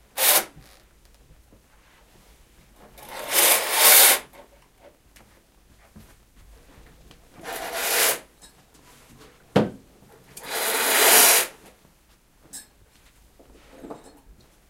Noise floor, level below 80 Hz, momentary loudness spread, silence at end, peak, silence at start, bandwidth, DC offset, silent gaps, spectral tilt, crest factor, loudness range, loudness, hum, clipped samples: -58 dBFS; -58 dBFS; 29 LU; 0.75 s; 0 dBFS; 0.15 s; 16 kHz; under 0.1%; none; -0.5 dB/octave; 26 dB; 10 LU; -17 LUFS; none; under 0.1%